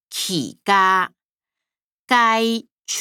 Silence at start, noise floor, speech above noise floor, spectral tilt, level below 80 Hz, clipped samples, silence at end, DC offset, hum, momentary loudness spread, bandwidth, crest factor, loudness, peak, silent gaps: 0.1 s; -88 dBFS; 70 dB; -2.5 dB/octave; -76 dBFS; under 0.1%; 0 s; under 0.1%; none; 12 LU; over 20 kHz; 18 dB; -18 LUFS; -4 dBFS; 1.25-1.29 s, 1.82-2.05 s, 2.72-2.76 s